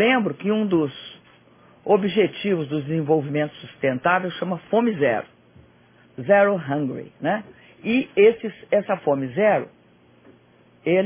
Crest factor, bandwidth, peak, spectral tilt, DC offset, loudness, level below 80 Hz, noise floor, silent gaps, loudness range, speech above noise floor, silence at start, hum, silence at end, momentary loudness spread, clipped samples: 18 dB; 3.6 kHz; -4 dBFS; -10 dB/octave; under 0.1%; -22 LUFS; -64 dBFS; -55 dBFS; none; 2 LU; 34 dB; 0 s; none; 0 s; 12 LU; under 0.1%